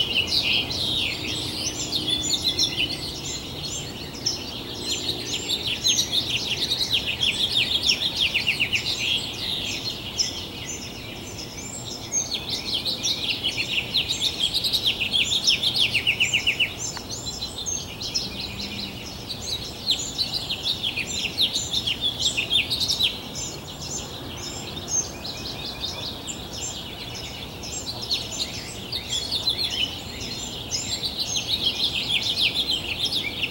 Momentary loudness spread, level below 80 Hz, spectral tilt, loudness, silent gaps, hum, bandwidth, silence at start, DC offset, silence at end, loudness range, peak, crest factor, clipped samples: 12 LU; -48 dBFS; -1 dB/octave; -24 LUFS; none; none; 17 kHz; 0 s; under 0.1%; 0 s; 8 LU; -6 dBFS; 20 dB; under 0.1%